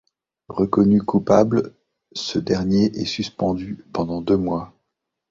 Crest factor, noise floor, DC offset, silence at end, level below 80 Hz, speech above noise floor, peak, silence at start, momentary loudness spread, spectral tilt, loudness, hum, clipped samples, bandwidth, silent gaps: 20 dB; -79 dBFS; under 0.1%; 0.65 s; -48 dBFS; 59 dB; -2 dBFS; 0.5 s; 13 LU; -7 dB/octave; -21 LUFS; none; under 0.1%; 7.6 kHz; none